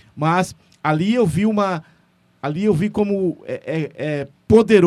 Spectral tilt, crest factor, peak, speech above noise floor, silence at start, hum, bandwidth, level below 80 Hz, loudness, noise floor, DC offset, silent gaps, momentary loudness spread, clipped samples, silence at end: -7 dB/octave; 18 dB; 0 dBFS; 40 dB; 0.15 s; none; 12.5 kHz; -48 dBFS; -20 LUFS; -58 dBFS; under 0.1%; none; 12 LU; under 0.1%; 0 s